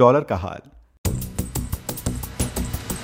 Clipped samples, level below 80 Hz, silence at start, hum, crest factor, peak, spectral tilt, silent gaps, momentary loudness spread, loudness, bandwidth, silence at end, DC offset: under 0.1%; -34 dBFS; 0 s; none; 22 dB; -2 dBFS; -5.5 dB/octave; 0.98-1.04 s; 7 LU; -26 LUFS; 16.5 kHz; 0 s; under 0.1%